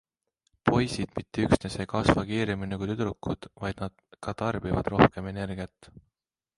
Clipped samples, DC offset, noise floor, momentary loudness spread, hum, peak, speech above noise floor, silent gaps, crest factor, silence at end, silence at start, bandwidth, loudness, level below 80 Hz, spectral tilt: under 0.1%; under 0.1%; -77 dBFS; 14 LU; none; -2 dBFS; 49 dB; none; 26 dB; 0.9 s; 0.65 s; 11.5 kHz; -28 LUFS; -46 dBFS; -6.5 dB/octave